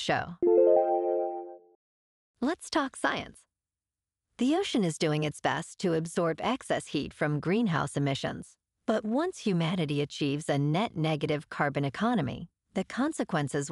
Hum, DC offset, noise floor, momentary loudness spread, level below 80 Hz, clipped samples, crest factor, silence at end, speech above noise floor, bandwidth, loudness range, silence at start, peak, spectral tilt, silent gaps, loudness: none; under 0.1%; under -90 dBFS; 8 LU; -64 dBFS; under 0.1%; 18 dB; 0 s; over 60 dB; 12 kHz; 3 LU; 0 s; -12 dBFS; -5.5 dB/octave; 1.75-2.34 s; -29 LUFS